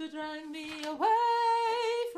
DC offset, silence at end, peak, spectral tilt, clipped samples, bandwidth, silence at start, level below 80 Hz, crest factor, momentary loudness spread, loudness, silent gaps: under 0.1%; 0 s; -18 dBFS; -2 dB/octave; under 0.1%; 14 kHz; 0 s; -74 dBFS; 12 dB; 13 LU; -30 LUFS; none